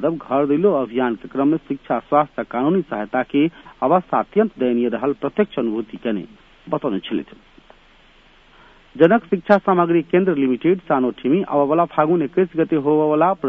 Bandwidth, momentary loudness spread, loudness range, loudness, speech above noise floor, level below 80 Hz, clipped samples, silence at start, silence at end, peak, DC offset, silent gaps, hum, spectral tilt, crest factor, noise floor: 5.4 kHz; 8 LU; 7 LU; -19 LUFS; 32 dB; -56 dBFS; under 0.1%; 0 s; 0 s; 0 dBFS; under 0.1%; none; none; -9.5 dB/octave; 20 dB; -51 dBFS